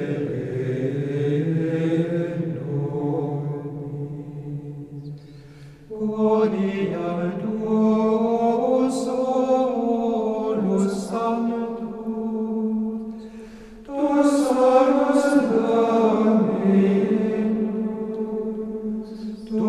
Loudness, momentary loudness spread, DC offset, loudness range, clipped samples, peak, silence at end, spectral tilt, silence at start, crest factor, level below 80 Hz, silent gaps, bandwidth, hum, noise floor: -22 LUFS; 15 LU; under 0.1%; 8 LU; under 0.1%; -4 dBFS; 0 s; -7.5 dB/octave; 0 s; 18 dB; -56 dBFS; none; 12 kHz; none; -43 dBFS